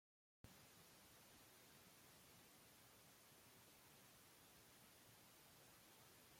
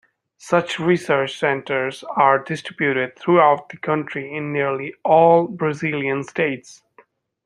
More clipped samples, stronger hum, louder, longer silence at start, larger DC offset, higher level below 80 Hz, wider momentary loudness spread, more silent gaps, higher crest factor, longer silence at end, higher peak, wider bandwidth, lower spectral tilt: neither; neither; second, -67 LUFS vs -19 LUFS; about the same, 0.45 s vs 0.45 s; neither; second, -88 dBFS vs -68 dBFS; second, 1 LU vs 10 LU; neither; about the same, 22 dB vs 18 dB; second, 0 s vs 0.7 s; second, -46 dBFS vs -2 dBFS; first, 16.5 kHz vs 11.5 kHz; second, -2.5 dB/octave vs -6 dB/octave